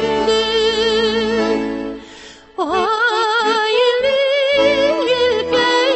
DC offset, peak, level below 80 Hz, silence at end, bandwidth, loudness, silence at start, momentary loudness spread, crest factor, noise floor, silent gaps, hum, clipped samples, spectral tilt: under 0.1%; -4 dBFS; -46 dBFS; 0 s; 8.6 kHz; -15 LUFS; 0 s; 9 LU; 12 dB; -39 dBFS; none; none; under 0.1%; -3 dB/octave